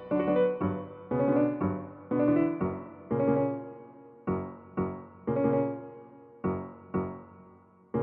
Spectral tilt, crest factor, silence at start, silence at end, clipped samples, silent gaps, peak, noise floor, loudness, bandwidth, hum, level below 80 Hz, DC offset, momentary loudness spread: -9 dB/octave; 16 dB; 0 s; 0 s; under 0.1%; none; -14 dBFS; -57 dBFS; -30 LUFS; 3.7 kHz; none; -60 dBFS; under 0.1%; 15 LU